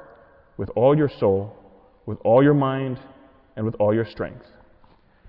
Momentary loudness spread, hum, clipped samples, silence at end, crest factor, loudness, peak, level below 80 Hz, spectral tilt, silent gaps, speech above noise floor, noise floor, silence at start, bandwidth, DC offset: 20 LU; none; under 0.1%; 0.9 s; 16 dB; -21 LUFS; -6 dBFS; -54 dBFS; -11.5 dB/octave; none; 34 dB; -55 dBFS; 0.6 s; 5.4 kHz; under 0.1%